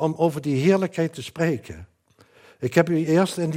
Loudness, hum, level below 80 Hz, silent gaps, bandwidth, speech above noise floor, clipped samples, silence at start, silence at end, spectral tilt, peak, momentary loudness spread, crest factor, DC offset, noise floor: -22 LUFS; none; -62 dBFS; none; 16 kHz; 35 dB; under 0.1%; 0 s; 0 s; -6.5 dB/octave; -4 dBFS; 11 LU; 20 dB; under 0.1%; -57 dBFS